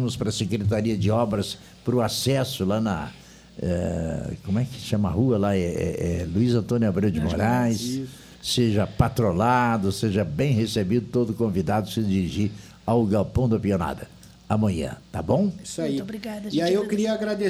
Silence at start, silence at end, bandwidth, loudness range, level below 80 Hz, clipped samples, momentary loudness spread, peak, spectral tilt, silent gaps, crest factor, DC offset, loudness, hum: 0 s; 0 s; 15.5 kHz; 3 LU; -44 dBFS; under 0.1%; 9 LU; -4 dBFS; -6.5 dB/octave; none; 20 dB; under 0.1%; -24 LUFS; none